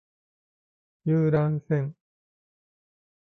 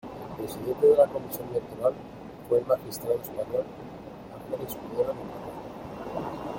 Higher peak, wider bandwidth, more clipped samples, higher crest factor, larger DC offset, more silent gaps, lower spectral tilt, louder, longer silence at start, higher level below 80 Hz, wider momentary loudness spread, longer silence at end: second, -12 dBFS vs -8 dBFS; second, 4 kHz vs 17 kHz; neither; about the same, 18 dB vs 20 dB; neither; neither; first, -11.5 dB/octave vs -6 dB/octave; about the same, -26 LUFS vs -28 LUFS; first, 1.05 s vs 0.05 s; second, -64 dBFS vs -58 dBFS; second, 11 LU vs 20 LU; first, 1.35 s vs 0 s